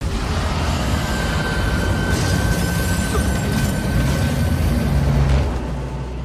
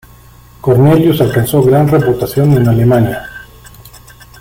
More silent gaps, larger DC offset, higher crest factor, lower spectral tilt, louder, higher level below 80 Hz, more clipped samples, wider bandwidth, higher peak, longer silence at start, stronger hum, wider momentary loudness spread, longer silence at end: neither; neither; about the same, 12 dB vs 10 dB; second, -5.5 dB/octave vs -7.5 dB/octave; second, -20 LUFS vs -10 LUFS; first, -24 dBFS vs -38 dBFS; neither; about the same, 16 kHz vs 16.5 kHz; second, -8 dBFS vs 0 dBFS; second, 0 s vs 0.65 s; neither; second, 4 LU vs 11 LU; second, 0 s vs 1 s